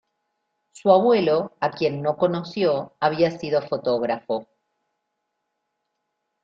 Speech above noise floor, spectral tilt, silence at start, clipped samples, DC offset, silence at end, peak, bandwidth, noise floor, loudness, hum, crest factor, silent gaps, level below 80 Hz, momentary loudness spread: 57 dB; -7 dB/octave; 0.85 s; under 0.1%; under 0.1%; 2 s; -4 dBFS; 8 kHz; -78 dBFS; -22 LUFS; none; 20 dB; none; -66 dBFS; 9 LU